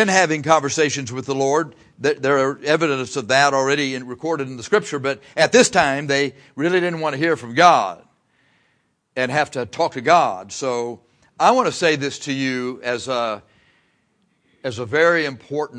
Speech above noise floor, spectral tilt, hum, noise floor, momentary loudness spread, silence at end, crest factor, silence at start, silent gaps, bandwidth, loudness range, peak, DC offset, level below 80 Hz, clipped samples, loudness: 47 dB; -3.5 dB/octave; none; -66 dBFS; 11 LU; 0 s; 20 dB; 0 s; none; 10.5 kHz; 5 LU; 0 dBFS; under 0.1%; -62 dBFS; under 0.1%; -19 LUFS